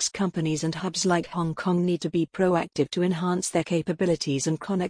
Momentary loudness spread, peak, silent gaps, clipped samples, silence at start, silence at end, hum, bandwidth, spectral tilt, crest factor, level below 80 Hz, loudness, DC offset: 3 LU; -8 dBFS; none; under 0.1%; 0 s; 0 s; none; 10.5 kHz; -5 dB/octave; 16 dB; -60 dBFS; -26 LUFS; under 0.1%